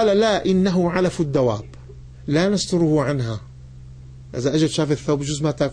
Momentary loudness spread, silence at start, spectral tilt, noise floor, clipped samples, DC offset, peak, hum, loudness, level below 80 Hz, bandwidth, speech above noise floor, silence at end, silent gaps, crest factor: 11 LU; 0 s; -6 dB/octave; -40 dBFS; under 0.1%; under 0.1%; -8 dBFS; none; -20 LUFS; -44 dBFS; 10 kHz; 20 dB; 0 s; none; 14 dB